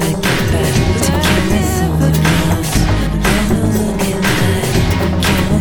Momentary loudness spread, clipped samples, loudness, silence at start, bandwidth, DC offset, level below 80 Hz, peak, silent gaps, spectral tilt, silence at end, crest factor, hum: 2 LU; under 0.1%; -14 LUFS; 0 s; 17.5 kHz; 2%; -22 dBFS; 0 dBFS; none; -5 dB/octave; 0 s; 12 dB; none